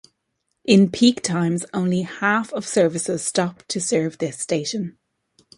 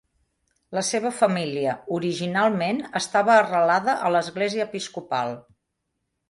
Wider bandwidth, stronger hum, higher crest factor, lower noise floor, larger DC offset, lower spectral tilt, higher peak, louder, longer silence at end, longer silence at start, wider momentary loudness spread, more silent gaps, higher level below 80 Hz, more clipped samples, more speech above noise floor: about the same, 11.5 kHz vs 11.5 kHz; neither; about the same, 20 dB vs 18 dB; about the same, -75 dBFS vs -78 dBFS; neither; about the same, -4.5 dB/octave vs -4.5 dB/octave; first, -2 dBFS vs -6 dBFS; about the same, -21 LUFS vs -23 LUFS; second, 0.65 s vs 0.9 s; about the same, 0.65 s vs 0.7 s; about the same, 10 LU vs 10 LU; neither; first, -62 dBFS vs -68 dBFS; neither; about the same, 54 dB vs 55 dB